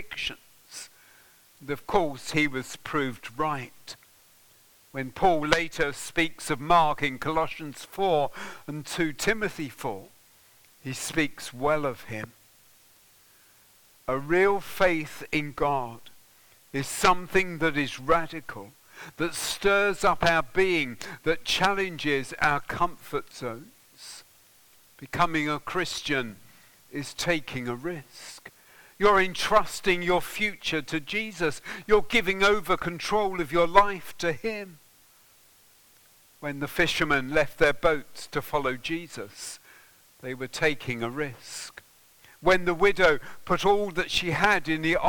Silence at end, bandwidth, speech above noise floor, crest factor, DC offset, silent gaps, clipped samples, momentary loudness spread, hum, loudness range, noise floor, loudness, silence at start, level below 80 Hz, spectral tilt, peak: 0 s; 19 kHz; 32 dB; 28 dB; under 0.1%; none; under 0.1%; 17 LU; none; 7 LU; -58 dBFS; -26 LUFS; 0 s; -48 dBFS; -4 dB/octave; 0 dBFS